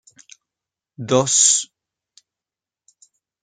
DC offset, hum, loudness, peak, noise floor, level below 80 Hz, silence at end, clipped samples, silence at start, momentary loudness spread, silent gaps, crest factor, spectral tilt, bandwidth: under 0.1%; none; -15 LUFS; -2 dBFS; -89 dBFS; -68 dBFS; 1.8 s; under 0.1%; 1 s; 22 LU; none; 22 dB; -2 dB/octave; 10.5 kHz